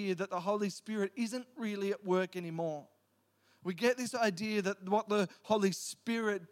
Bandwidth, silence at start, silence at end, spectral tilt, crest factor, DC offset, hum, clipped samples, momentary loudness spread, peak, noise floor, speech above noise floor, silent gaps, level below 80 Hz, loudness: 16.5 kHz; 0 s; 0.05 s; -5 dB/octave; 20 dB; under 0.1%; none; under 0.1%; 7 LU; -14 dBFS; -74 dBFS; 40 dB; none; -88 dBFS; -35 LUFS